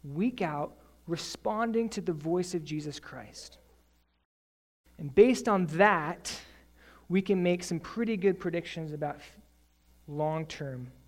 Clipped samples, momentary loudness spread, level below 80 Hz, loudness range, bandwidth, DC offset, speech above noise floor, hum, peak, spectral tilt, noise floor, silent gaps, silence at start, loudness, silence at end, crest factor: under 0.1%; 19 LU; -60 dBFS; 7 LU; 15.5 kHz; under 0.1%; 37 dB; none; -8 dBFS; -5.5 dB/octave; -67 dBFS; 4.25-4.84 s; 0.05 s; -30 LUFS; 0.15 s; 22 dB